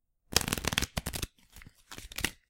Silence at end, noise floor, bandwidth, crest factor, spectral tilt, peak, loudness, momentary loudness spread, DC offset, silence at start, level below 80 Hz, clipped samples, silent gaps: 0.15 s; -55 dBFS; 17 kHz; 34 dB; -2 dB/octave; -2 dBFS; -32 LUFS; 15 LU; under 0.1%; 0.3 s; -46 dBFS; under 0.1%; none